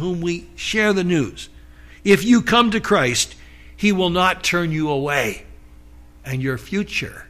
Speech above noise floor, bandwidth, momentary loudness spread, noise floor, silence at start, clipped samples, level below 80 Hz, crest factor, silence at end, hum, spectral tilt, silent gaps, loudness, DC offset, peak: 25 dB; 15.5 kHz; 12 LU; -44 dBFS; 0 s; under 0.1%; -44 dBFS; 16 dB; 0.05 s; 60 Hz at -40 dBFS; -4.5 dB/octave; none; -19 LUFS; under 0.1%; -4 dBFS